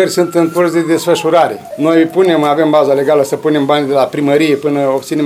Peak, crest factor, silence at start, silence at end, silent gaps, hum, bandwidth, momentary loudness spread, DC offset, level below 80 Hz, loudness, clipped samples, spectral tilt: 0 dBFS; 12 dB; 0 s; 0 s; none; none; 16 kHz; 3 LU; under 0.1%; -60 dBFS; -12 LUFS; under 0.1%; -5.5 dB/octave